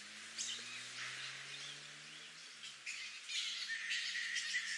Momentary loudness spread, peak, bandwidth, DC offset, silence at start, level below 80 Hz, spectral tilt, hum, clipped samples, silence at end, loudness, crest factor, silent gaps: 12 LU; -26 dBFS; 11.5 kHz; under 0.1%; 0 s; under -90 dBFS; 1.5 dB/octave; none; under 0.1%; 0 s; -43 LUFS; 20 dB; none